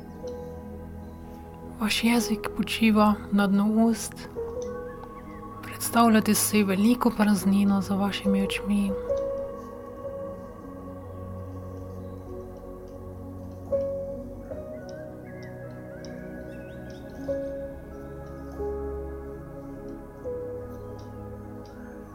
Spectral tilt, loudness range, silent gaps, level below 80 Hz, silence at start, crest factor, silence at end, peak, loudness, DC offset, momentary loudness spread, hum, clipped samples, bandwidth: -5 dB/octave; 15 LU; none; -48 dBFS; 0 s; 20 dB; 0 s; -8 dBFS; -26 LUFS; under 0.1%; 19 LU; none; under 0.1%; 18.5 kHz